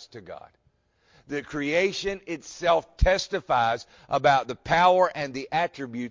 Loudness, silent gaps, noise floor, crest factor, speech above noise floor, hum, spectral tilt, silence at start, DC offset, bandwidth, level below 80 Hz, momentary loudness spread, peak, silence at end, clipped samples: -25 LUFS; none; -63 dBFS; 18 dB; 38 dB; none; -4.5 dB/octave; 0 s; under 0.1%; 7.6 kHz; -38 dBFS; 14 LU; -8 dBFS; 0 s; under 0.1%